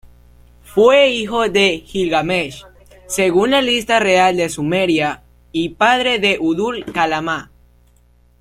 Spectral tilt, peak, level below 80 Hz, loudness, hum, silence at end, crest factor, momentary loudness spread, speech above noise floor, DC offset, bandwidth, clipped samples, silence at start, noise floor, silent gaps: -4 dB/octave; -2 dBFS; -46 dBFS; -16 LUFS; 60 Hz at -45 dBFS; 0.95 s; 16 dB; 10 LU; 37 dB; under 0.1%; 15.5 kHz; under 0.1%; 0.05 s; -52 dBFS; none